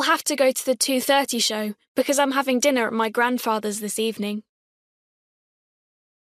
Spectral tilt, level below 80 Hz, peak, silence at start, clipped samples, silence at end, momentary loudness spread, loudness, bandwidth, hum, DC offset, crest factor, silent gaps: -2 dB/octave; -72 dBFS; -8 dBFS; 0 s; under 0.1%; 1.85 s; 8 LU; -22 LUFS; 15.5 kHz; none; under 0.1%; 16 dB; 1.88-1.95 s